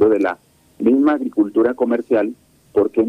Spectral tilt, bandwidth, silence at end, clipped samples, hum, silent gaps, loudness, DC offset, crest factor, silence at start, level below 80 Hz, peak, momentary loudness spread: -8 dB/octave; 9 kHz; 0 s; under 0.1%; none; none; -18 LUFS; under 0.1%; 14 dB; 0 s; -58 dBFS; -4 dBFS; 7 LU